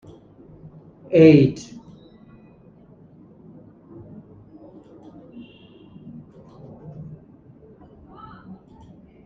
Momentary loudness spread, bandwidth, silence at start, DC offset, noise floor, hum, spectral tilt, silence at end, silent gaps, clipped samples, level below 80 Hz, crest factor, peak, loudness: 32 LU; 7.4 kHz; 1.1 s; under 0.1%; -50 dBFS; none; -8.5 dB/octave; 2.2 s; none; under 0.1%; -58 dBFS; 22 dB; -2 dBFS; -15 LUFS